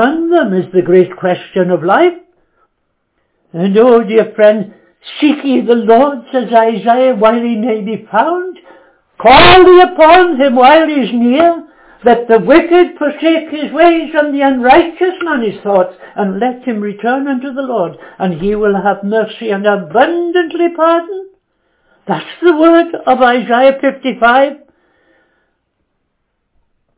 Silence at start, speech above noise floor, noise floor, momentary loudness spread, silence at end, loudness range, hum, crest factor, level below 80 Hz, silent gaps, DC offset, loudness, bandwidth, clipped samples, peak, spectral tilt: 0 s; 57 dB; -66 dBFS; 11 LU; 2.4 s; 8 LU; none; 10 dB; -40 dBFS; none; under 0.1%; -10 LUFS; 4 kHz; 1%; 0 dBFS; -9.5 dB/octave